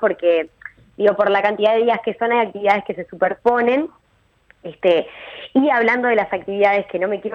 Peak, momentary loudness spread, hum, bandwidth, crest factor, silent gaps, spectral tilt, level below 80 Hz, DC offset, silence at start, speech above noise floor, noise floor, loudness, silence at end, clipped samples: -4 dBFS; 14 LU; none; 6.8 kHz; 16 dB; none; -6.5 dB/octave; -60 dBFS; under 0.1%; 0 s; 42 dB; -60 dBFS; -18 LUFS; 0 s; under 0.1%